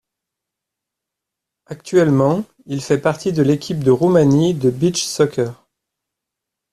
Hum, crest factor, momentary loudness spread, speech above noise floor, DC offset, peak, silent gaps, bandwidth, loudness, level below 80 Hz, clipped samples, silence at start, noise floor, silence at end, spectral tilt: none; 16 dB; 12 LU; 67 dB; under 0.1%; -2 dBFS; none; 14 kHz; -17 LUFS; -54 dBFS; under 0.1%; 1.7 s; -83 dBFS; 1.2 s; -6 dB/octave